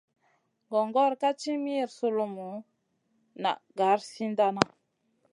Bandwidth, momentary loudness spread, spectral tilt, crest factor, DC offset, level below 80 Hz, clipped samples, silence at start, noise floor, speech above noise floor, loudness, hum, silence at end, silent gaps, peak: 11.5 kHz; 8 LU; -5 dB/octave; 28 dB; under 0.1%; -74 dBFS; under 0.1%; 0.7 s; -74 dBFS; 46 dB; -29 LUFS; none; 0.65 s; none; -2 dBFS